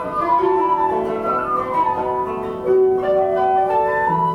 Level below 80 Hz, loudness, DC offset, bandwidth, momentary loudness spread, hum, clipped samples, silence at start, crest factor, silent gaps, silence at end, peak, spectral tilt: -50 dBFS; -18 LUFS; under 0.1%; 5.8 kHz; 5 LU; none; under 0.1%; 0 s; 12 dB; none; 0 s; -6 dBFS; -8 dB/octave